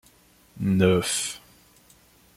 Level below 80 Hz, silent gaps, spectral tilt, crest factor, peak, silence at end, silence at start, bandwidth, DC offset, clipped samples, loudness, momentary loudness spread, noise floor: -58 dBFS; none; -4.5 dB/octave; 22 dB; -6 dBFS; 1 s; 0.55 s; 15.5 kHz; under 0.1%; under 0.1%; -24 LUFS; 12 LU; -57 dBFS